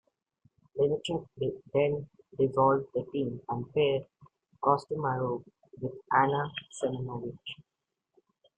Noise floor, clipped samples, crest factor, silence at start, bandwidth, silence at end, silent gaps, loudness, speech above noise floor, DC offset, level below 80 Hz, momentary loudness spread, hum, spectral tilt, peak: -85 dBFS; under 0.1%; 22 dB; 0.75 s; 9.2 kHz; 0.95 s; none; -31 LUFS; 55 dB; under 0.1%; -66 dBFS; 14 LU; none; -6.5 dB/octave; -10 dBFS